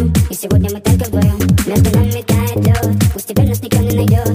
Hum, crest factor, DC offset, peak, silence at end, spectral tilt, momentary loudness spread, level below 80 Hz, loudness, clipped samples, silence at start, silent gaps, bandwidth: none; 12 dB; under 0.1%; 0 dBFS; 0 s; -6.5 dB/octave; 3 LU; -24 dBFS; -14 LUFS; under 0.1%; 0 s; none; 16 kHz